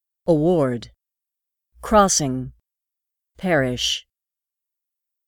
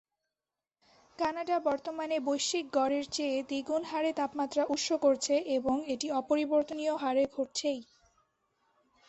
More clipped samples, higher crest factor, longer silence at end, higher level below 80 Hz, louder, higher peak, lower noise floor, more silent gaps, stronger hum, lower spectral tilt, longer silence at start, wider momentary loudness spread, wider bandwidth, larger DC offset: neither; about the same, 22 dB vs 18 dB; about the same, 1.25 s vs 1.25 s; first, -46 dBFS vs -70 dBFS; first, -20 LUFS vs -31 LUFS; first, -2 dBFS vs -14 dBFS; about the same, -88 dBFS vs under -90 dBFS; neither; neither; first, -4 dB/octave vs -2.5 dB/octave; second, 0.25 s vs 1.2 s; first, 15 LU vs 6 LU; first, 19 kHz vs 8.4 kHz; neither